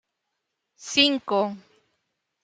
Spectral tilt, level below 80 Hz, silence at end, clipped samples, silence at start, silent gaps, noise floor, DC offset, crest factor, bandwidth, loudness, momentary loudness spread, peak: -2.5 dB/octave; -74 dBFS; 0.85 s; under 0.1%; 0.8 s; none; -80 dBFS; under 0.1%; 24 dB; 9.4 kHz; -22 LUFS; 22 LU; -4 dBFS